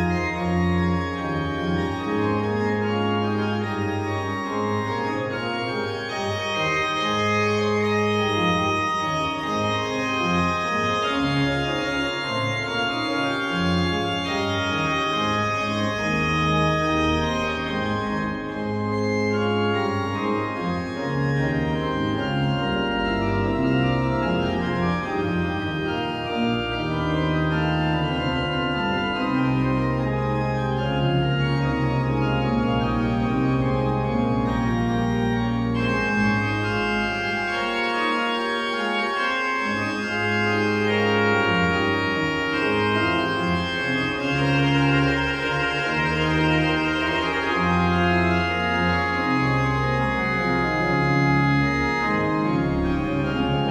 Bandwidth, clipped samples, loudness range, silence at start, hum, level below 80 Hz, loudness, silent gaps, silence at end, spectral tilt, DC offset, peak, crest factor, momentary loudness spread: 12 kHz; under 0.1%; 3 LU; 0 s; none; -40 dBFS; -23 LUFS; none; 0 s; -6 dB/octave; under 0.1%; -8 dBFS; 14 dB; 5 LU